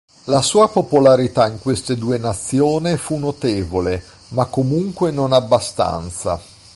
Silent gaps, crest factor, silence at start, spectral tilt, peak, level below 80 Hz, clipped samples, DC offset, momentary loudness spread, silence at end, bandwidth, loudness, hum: none; 16 dB; 0.25 s; -5.5 dB/octave; -2 dBFS; -42 dBFS; under 0.1%; under 0.1%; 10 LU; 0.3 s; 11.5 kHz; -18 LUFS; none